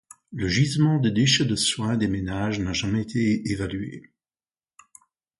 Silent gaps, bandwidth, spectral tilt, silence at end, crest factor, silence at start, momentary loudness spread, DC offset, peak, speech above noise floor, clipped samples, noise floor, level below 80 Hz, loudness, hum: none; 11.5 kHz; -4.5 dB/octave; 1.4 s; 16 dB; 0.3 s; 11 LU; under 0.1%; -8 dBFS; over 67 dB; under 0.1%; under -90 dBFS; -46 dBFS; -23 LUFS; none